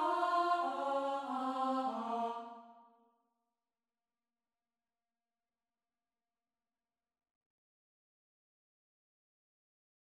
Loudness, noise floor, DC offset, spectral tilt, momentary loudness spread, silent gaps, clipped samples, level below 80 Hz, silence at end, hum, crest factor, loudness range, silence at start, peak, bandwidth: -36 LUFS; under -90 dBFS; under 0.1%; -4 dB/octave; 11 LU; none; under 0.1%; -90 dBFS; 7.4 s; none; 22 dB; 12 LU; 0 s; -20 dBFS; 12.5 kHz